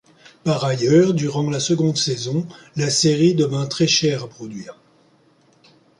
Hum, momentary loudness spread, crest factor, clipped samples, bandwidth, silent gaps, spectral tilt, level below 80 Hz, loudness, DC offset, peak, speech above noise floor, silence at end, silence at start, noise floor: none; 16 LU; 16 dB; under 0.1%; 11.5 kHz; none; -5 dB/octave; -60 dBFS; -19 LUFS; under 0.1%; -4 dBFS; 38 dB; 1.25 s; 0.45 s; -56 dBFS